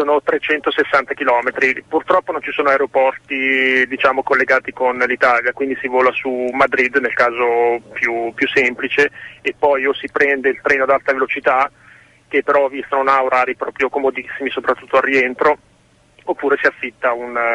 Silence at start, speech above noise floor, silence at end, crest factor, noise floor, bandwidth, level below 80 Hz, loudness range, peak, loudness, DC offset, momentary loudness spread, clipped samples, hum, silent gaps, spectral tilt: 0 s; 37 dB; 0 s; 14 dB; -53 dBFS; 10.5 kHz; -56 dBFS; 3 LU; -2 dBFS; -16 LUFS; under 0.1%; 6 LU; under 0.1%; none; none; -4.5 dB/octave